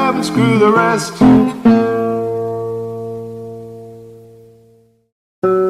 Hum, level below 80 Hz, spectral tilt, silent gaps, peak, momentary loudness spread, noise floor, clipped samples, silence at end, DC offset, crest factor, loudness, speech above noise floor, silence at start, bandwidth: none; -48 dBFS; -6.5 dB/octave; 5.12-5.42 s; -2 dBFS; 20 LU; -51 dBFS; under 0.1%; 0 s; under 0.1%; 14 dB; -14 LUFS; 40 dB; 0 s; 13.5 kHz